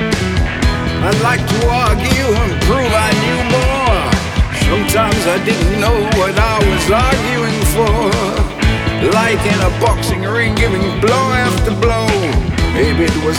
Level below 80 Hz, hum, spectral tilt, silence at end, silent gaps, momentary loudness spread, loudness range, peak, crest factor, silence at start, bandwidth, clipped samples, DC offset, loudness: -20 dBFS; none; -5 dB/octave; 0 s; none; 3 LU; 1 LU; 0 dBFS; 12 dB; 0 s; 18 kHz; under 0.1%; under 0.1%; -13 LUFS